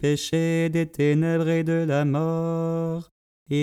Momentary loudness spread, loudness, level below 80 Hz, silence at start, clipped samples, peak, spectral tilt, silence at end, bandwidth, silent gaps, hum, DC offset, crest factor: 6 LU; -24 LUFS; -58 dBFS; 0 s; under 0.1%; -10 dBFS; -7 dB/octave; 0 s; 13.5 kHz; 3.11-3.46 s; none; under 0.1%; 12 dB